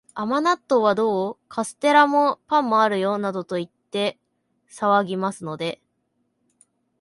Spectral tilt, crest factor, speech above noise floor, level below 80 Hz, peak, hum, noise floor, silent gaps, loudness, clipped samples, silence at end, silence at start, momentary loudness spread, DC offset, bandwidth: -5 dB/octave; 20 dB; 51 dB; -70 dBFS; -2 dBFS; none; -72 dBFS; none; -22 LUFS; under 0.1%; 1.25 s; 0.15 s; 12 LU; under 0.1%; 11.5 kHz